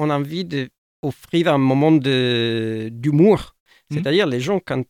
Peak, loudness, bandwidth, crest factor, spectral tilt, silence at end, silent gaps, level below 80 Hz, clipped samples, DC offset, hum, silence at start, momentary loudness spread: -4 dBFS; -19 LUFS; 15 kHz; 16 dB; -7 dB/octave; 0.05 s; 0.78-1.03 s, 3.60-3.66 s; -52 dBFS; under 0.1%; under 0.1%; none; 0 s; 13 LU